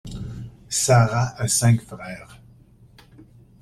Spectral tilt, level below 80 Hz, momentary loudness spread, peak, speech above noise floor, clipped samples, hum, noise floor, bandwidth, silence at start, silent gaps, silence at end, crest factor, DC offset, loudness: -4.5 dB/octave; -46 dBFS; 19 LU; -4 dBFS; 31 dB; under 0.1%; none; -51 dBFS; 15 kHz; 0.05 s; none; 0.4 s; 20 dB; under 0.1%; -20 LUFS